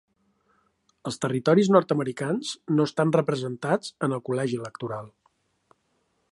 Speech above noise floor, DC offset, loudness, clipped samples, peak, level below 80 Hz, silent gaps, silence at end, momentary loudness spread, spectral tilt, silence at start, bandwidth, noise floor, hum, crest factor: 47 dB; under 0.1%; -25 LUFS; under 0.1%; -4 dBFS; -70 dBFS; none; 1.25 s; 14 LU; -6.5 dB/octave; 1.05 s; 11.5 kHz; -72 dBFS; none; 22 dB